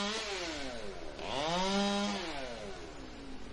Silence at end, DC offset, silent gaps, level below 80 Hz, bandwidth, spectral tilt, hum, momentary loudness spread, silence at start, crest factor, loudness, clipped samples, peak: 0 s; under 0.1%; none; -52 dBFS; 11.5 kHz; -3.5 dB/octave; none; 16 LU; 0 s; 16 dB; -36 LUFS; under 0.1%; -20 dBFS